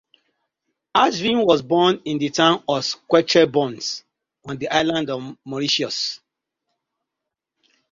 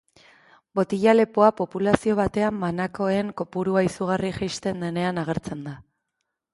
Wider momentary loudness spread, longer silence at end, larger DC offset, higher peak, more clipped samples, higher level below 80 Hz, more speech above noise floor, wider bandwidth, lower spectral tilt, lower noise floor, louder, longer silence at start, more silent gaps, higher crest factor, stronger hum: about the same, 13 LU vs 11 LU; first, 1.75 s vs 0.7 s; neither; about the same, -2 dBFS vs 0 dBFS; neither; second, -62 dBFS vs -52 dBFS; first, 64 dB vs 57 dB; second, 7.6 kHz vs 11.5 kHz; second, -4 dB/octave vs -6.5 dB/octave; first, -84 dBFS vs -80 dBFS; first, -20 LUFS vs -23 LUFS; first, 0.95 s vs 0.75 s; neither; about the same, 20 dB vs 24 dB; neither